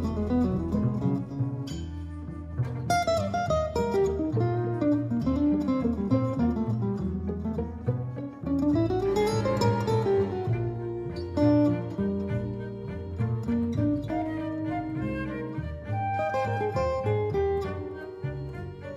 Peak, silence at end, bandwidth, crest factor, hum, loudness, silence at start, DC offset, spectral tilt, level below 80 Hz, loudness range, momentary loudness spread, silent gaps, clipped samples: -12 dBFS; 0 s; 13 kHz; 16 dB; none; -28 LUFS; 0 s; under 0.1%; -8 dB/octave; -44 dBFS; 4 LU; 10 LU; none; under 0.1%